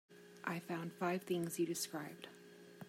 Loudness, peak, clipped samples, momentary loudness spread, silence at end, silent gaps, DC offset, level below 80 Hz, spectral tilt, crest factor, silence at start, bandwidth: -42 LUFS; -24 dBFS; under 0.1%; 19 LU; 0 s; none; under 0.1%; -88 dBFS; -4.5 dB/octave; 18 dB; 0.1 s; 16 kHz